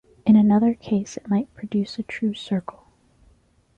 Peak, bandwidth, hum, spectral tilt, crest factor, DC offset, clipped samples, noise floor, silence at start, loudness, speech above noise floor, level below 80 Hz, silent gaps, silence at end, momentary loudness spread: -6 dBFS; 8 kHz; none; -7 dB/octave; 16 dB; under 0.1%; under 0.1%; -59 dBFS; 0.25 s; -22 LUFS; 35 dB; -58 dBFS; none; 1.15 s; 12 LU